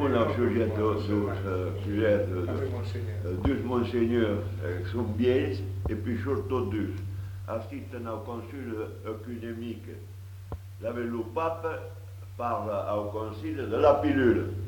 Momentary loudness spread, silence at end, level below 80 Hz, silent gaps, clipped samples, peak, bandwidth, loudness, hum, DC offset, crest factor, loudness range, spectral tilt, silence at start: 13 LU; 0 s; -48 dBFS; none; under 0.1%; -8 dBFS; 19 kHz; -30 LUFS; none; under 0.1%; 20 dB; 9 LU; -8.5 dB/octave; 0 s